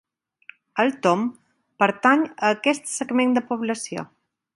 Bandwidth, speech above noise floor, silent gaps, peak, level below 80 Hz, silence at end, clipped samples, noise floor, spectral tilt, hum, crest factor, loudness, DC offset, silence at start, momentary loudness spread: 11.5 kHz; 29 dB; none; -2 dBFS; -72 dBFS; 0.5 s; under 0.1%; -50 dBFS; -4 dB/octave; none; 22 dB; -22 LUFS; under 0.1%; 0.75 s; 12 LU